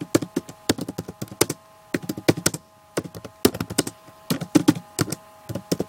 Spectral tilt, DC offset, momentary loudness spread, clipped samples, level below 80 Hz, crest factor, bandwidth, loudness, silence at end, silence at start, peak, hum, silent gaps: -4.5 dB/octave; under 0.1%; 14 LU; under 0.1%; -54 dBFS; 26 dB; 17 kHz; -25 LUFS; 0 s; 0 s; 0 dBFS; none; none